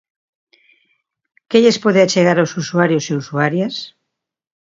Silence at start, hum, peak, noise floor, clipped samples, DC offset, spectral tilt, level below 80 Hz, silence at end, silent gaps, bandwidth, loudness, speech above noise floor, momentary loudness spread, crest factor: 1.5 s; none; 0 dBFS; -77 dBFS; under 0.1%; under 0.1%; -5 dB/octave; -64 dBFS; 0.8 s; none; 7.8 kHz; -15 LUFS; 63 dB; 10 LU; 18 dB